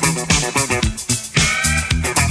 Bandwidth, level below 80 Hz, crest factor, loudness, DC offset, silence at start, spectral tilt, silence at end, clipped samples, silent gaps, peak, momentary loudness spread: 11 kHz; -28 dBFS; 16 dB; -16 LUFS; under 0.1%; 0 s; -3 dB/octave; 0 s; under 0.1%; none; -2 dBFS; 4 LU